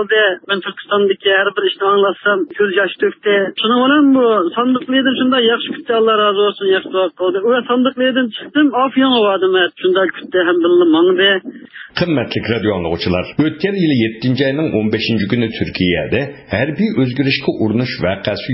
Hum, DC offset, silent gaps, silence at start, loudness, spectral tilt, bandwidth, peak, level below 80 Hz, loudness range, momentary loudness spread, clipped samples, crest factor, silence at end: none; under 0.1%; none; 0 s; -15 LUFS; -10 dB/octave; 5.8 kHz; 0 dBFS; -44 dBFS; 3 LU; 7 LU; under 0.1%; 14 dB; 0 s